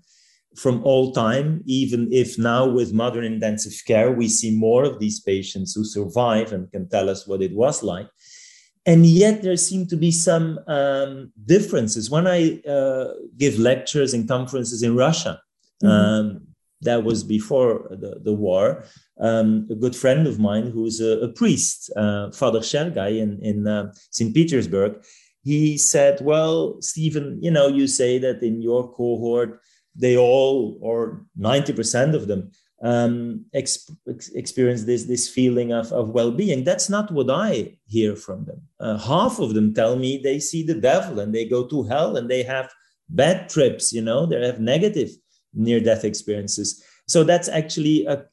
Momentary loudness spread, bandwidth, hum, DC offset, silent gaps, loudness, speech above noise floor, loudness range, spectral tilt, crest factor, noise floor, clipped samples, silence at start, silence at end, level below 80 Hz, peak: 10 LU; 12.5 kHz; none; under 0.1%; none; -20 LUFS; 39 dB; 4 LU; -5 dB/octave; 18 dB; -59 dBFS; under 0.1%; 0.55 s; 0.1 s; -56 dBFS; -2 dBFS